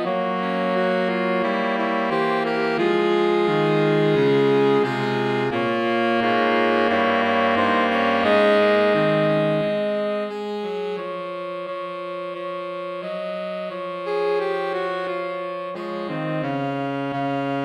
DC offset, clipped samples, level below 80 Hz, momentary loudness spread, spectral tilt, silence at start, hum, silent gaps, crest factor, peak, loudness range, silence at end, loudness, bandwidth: under 0.1%; under 0.1%; -68 dBFS; 11 LU; -7 dB/octave; 0 s; none; none; 14 dB; -6 dBFS; 9 LU; 0 s; -22 LUFS; 10.5 kHz